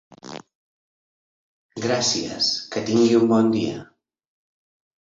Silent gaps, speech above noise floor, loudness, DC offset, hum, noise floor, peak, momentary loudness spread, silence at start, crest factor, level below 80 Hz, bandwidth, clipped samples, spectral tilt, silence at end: 0.55-1.69 s; over 70 dB; -20 LUFS; under 0.1%; none; under -90 dBFS; -6 dBFS; 22 LU; 0.25 s; 18 dB; -62 dBFS; 7.8 kHz; under 0.1%; -4 dB/octave; 1.2 s